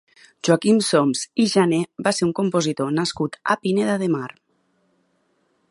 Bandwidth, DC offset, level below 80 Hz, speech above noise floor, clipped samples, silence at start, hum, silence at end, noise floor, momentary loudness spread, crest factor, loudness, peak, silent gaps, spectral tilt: 11.5 kHz; under 0.1%; -64 dBFS; 46 dB; under 0.1%; 0.45 s; none; 1.45 s; -66 dBFS; 7 LU; 20 dB; -21 LUFS; -2 dBFS; none; -5 dB/octave